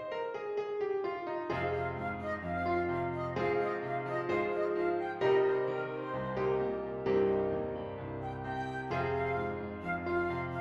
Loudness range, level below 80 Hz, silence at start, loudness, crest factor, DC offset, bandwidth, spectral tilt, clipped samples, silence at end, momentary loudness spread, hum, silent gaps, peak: 3 LU; -60 dBFS; 0 s; -34 LUFS; 14 dB; under 0.1%; 6.8 kHz; -8 dB/octave; under 0.1%; 0 s; 8 LU; none; none; -18 dBFS